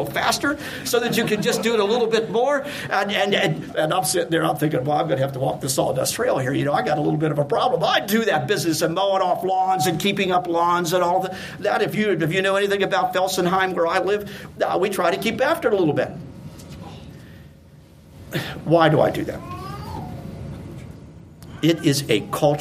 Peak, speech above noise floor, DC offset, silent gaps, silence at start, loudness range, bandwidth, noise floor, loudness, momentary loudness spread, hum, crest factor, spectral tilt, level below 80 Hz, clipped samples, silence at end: -2 dBFS; 26 dB; under 0.1%; none; 0 s; 4 LU; 15.5 kHz; -47 dBFS; -21 LUFS; 14 LU; none; 18 dB; -4.5 dB/octave; -52 dBFS; under 0.1%; 0 s